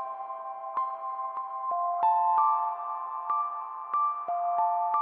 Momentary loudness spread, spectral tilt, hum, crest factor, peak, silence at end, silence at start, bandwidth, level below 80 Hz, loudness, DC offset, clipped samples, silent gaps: 11 LU; -5.5 dB/octave; none; 16 dB; -14 dBFS; 0 s; 0 s; 3.7 kHz; under -90 dBFS; -29 LUFS; under 0.1%; under 0.1%; none